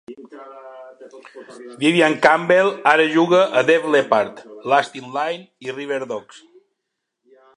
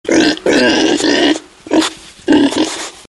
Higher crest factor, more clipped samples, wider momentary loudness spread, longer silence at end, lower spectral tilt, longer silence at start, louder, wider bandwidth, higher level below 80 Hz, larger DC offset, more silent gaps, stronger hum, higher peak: first, 20 dB vs 12 dB; neither; first, 24 LU vs 8 LU; first, 1.35 s vs 0.15 s; first, -5 dB/octave vs -3 dB/octave; about the same, 0.1 s vs 0.05 s; second, -17 LUFS vs -13 LUFS; about the same, 11 kHz vs 12 kHz; second, -70 dBFS vs -46 dBFS; neither; neither; neither; about the same, 0 dBFS vs 0 dBFS